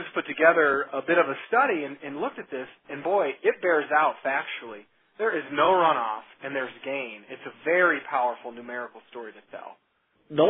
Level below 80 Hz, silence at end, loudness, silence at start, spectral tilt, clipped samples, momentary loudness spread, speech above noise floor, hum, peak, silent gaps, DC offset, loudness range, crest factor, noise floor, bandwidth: -74 dBFS; 0 s; -25 LUFS; 0 s; -8.5 dB/octave; under 0.1%; 19 LU; 26 dB; none; -6 dBFS; none; under 0.1%; 4 LU; 20 dB; -52 dBFS; 4 kHz